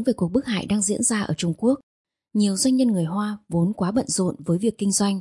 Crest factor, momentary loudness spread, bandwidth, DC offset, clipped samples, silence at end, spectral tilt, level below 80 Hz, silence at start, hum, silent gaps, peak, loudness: 14 dB; 6 LU; 11.5 kHz; under 0.1%; under 0.1%; 0 s; -5 dB/octave; -56 dBFS; 0 s; none; 1.83-2.05 s; -8 dBFS; -22 LUFS